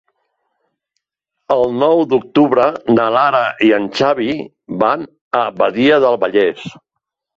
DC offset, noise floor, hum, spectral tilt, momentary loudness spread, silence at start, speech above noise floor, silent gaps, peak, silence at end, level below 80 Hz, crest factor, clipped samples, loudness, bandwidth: under 0.1%; -78 dBFS; none; -6.5 dB/octave; 9 LU; 1.5 s; 64 dB; 5.21-5.31 s; 0 dBFS; 0.65 s; -56 dBFS; 14 dB; under 0.1%; -14 LUFS; 7.8 kHz